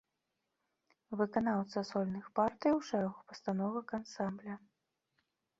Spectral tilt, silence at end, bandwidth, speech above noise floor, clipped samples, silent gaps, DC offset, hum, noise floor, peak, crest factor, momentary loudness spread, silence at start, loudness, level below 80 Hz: -6 dB/octave; 1 s; 7.8 kHz; 50 dB; under 0.1%; none; under 0.1%; none; -86 dBFS; -18 dBFS; 20 dB; 12 LU; 1.1 s; -37 LUFS; -74 dBFS